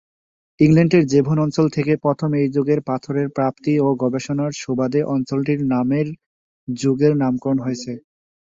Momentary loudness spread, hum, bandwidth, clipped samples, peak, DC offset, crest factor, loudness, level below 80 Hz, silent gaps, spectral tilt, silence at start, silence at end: 10 LU; none; 7.8 kHz; under 0.1%; -2 dBFS; under 0.1%; 16 dB; -19 LUFS; -56 dBFS; 6.26-6.67 s; -7.5 dB/octave; 0.6 s; 0.45 s